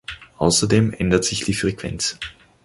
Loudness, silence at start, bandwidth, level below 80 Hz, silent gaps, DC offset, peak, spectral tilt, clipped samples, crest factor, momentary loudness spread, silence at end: -20 LUFS; 0.1 s; 11.5 kHz; -40 dBFS; none; under 0.1%; -2 dBFS; -4 dB/octave; under 0.1%; 20 dB; 15 LU; 0.35 s